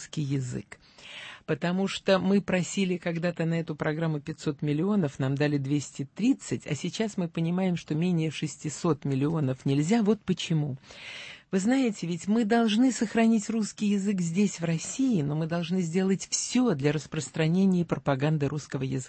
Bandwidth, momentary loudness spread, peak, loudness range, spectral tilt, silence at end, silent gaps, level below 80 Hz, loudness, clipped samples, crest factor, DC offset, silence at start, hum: 8.8 kHz; 9 LU; -12 dBFS; 3 LU; -6 dB/octave; 0 s; none; -62 dBFS; -28 LUFS; under 0.1%; 16 dB; under 0.1%; 0 s; none